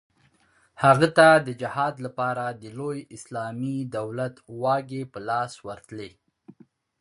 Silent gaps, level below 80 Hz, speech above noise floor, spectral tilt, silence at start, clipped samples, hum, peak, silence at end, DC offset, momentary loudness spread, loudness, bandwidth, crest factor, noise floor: none; -64 dBFS; 39 dB; -5.5 dB/octave; 0.8 s; under 0.1%; none; -2 dBFS; 0.5 s; under 0.1%; 21 LU; -24 LUFS; 11.5 kHz; 24 dB; -63 dBFS